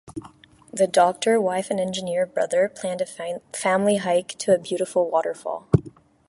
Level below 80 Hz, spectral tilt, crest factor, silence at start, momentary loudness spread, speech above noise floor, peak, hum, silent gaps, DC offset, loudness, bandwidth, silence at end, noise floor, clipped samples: -52 dBFS; -5 dB/octave; 20 dB; 0.05 s; 11 LU; 27 dB; -2 dBFS; none; none; under 0.1%; -23 LUFS; 11.5 kHz; 0.4 s; -49 dBFS; under 0.1%